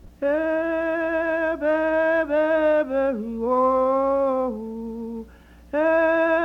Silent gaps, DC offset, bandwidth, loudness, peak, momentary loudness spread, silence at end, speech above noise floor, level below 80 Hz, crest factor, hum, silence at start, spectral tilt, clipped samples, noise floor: none; under 0.1%; 6.2 kHz; -22 LUFS; -8 dBFS; 12 LU; 0 s; 25 dB; -50 dBFS; 12 dB; none; 0.05 s; -7 dB/octave; under 0.1%; -47 dBFS